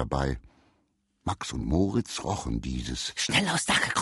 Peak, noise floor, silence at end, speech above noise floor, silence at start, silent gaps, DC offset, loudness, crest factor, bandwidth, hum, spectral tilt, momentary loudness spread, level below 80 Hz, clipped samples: -10 dBFS; -72 dBFS; 0 s; 44 dB; 0 s; none; under 0.1%; -28 LUFS; 20 dB; 11.5 kHz; none; -3.5 dB/octave; 9 LU; -40 dBFS; under 0.1%